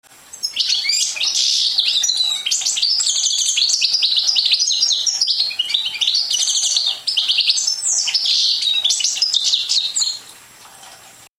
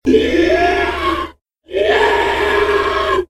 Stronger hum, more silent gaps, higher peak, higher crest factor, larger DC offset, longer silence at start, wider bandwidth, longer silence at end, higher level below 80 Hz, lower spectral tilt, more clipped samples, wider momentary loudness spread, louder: neither; second, none vs 1.41-1.45 s; about the same, -2 dBFS vs 0 dBFS; about the same, 18 dB vs 14 dB; neither; first, 0.35 s vs 0.05 s; first, 16.5 kHz vs 13.5 kHz; first, 0.25 s vs 0.05 s; second, -70 dBFS vs -34 dBFS; second, 5 dB/octave vs -5 dB/octave; neither; second, 3 LU vs 7 LU; about the same, -15 LUFS vs -15 LUFS